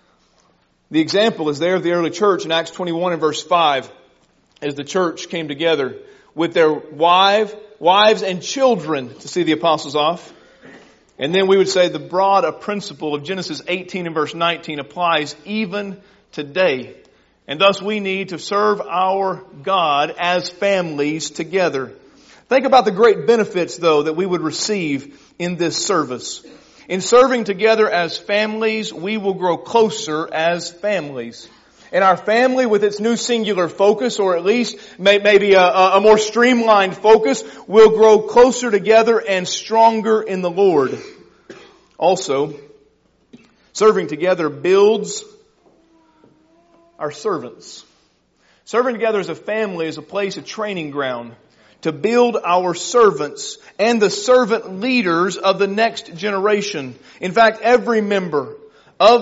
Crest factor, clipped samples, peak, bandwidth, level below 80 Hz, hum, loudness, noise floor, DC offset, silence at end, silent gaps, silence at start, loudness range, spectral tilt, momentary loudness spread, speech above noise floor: 16 dB; under 0.1%; 0 dBFS; 8 kHz; -60 dBFS; none; -17 LUFS; -59 dBFS; under 0.1%; 0 s; none; 0.9 s; 8 LU; -2.5 dB/octave; 13 LU; 43 dB